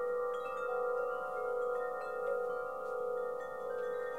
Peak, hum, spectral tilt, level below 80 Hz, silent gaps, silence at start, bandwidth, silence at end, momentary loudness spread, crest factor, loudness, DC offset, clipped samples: -26 dBFS; none; -4.5 dB/octave; -76 dBFS; none; 0 s; 15.5 kHz; 0 s; 4 LU; 12 dB; -38 LUFS; 0.1%; under 0.1%